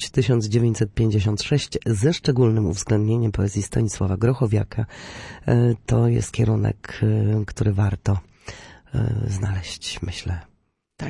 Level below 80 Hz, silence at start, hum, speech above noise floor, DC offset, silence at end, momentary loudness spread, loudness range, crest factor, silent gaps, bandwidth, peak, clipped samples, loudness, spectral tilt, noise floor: -40 dBFS; 0 s; none; 38 dB; under 0.1%; 0 s; 11 LU; 4 LU; 16 dB; none; 11.5 kHz; -6 dBFS; under 0.1%; -22 LUFS; -6.5 dB/octave; -59 dBFS